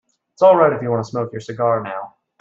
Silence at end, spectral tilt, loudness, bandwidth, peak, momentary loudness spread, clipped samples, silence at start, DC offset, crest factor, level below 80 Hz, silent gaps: 0.35 s; -7.5 dB/octave; -17 LUFS; 7.6 kHz; -2 dBFS; 17 LU; under 0.1%; 0.4 s; under 0.1%; 16 dB; -62 dBFS; none